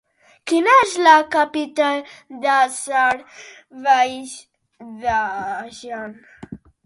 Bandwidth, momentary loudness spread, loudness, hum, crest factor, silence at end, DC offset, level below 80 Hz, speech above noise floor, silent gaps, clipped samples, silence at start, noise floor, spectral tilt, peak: 11.5 kHz; 23 LU; -18 LUFS; none; 20 dB; 0.3 s; under 0.1%; -56 dBFS; 20 dB; none; under 0.1%; 0.45 s; -39 dBFS; -2.5 dB/octave; 0 dBFS